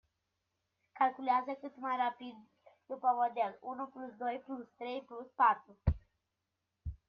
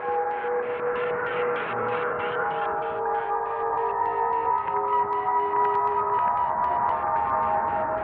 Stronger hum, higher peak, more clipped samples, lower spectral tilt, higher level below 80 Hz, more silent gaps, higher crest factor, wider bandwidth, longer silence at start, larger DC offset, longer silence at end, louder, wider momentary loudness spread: neither; second, -16 dBFS vs -12 dBFS; neither; about the same, -8.5 dB/octave vs -8 dB/octave; first, -50 dBFS vs -58 dBFS; neither; first, 22 dB vs 12 dB; first, 5.6 kHz vs 4.4 kHz; first, 0.95 s vs 0 s; neither; first, 0.15 s vs 0 s; second, -36 LUFS vs -25 LUFS; first, 17 LU vs 4 LU